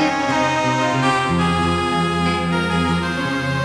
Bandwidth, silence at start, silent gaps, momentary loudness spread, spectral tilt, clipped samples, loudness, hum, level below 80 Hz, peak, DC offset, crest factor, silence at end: 12 kHz; 0 s; none; 3 LU; -5.5 dB/octave; under 0.1%; -18 LUFS; none; -40 dBFS; -4 dBFS; under 0.1%; 14 dB; 0 s